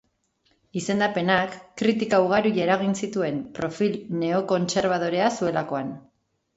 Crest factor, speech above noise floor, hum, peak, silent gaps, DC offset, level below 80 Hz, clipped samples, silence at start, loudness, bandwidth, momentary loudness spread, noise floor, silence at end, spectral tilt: 18 dB; 45 dB; none; -6 dBFS; none; under 0.1%; -62 dBFS; under 0.1%; 0.75 s; -24 LUFS; 8 kHz; 10 LU; -68 dBFS; 0.55 s; -5.5 dB/octave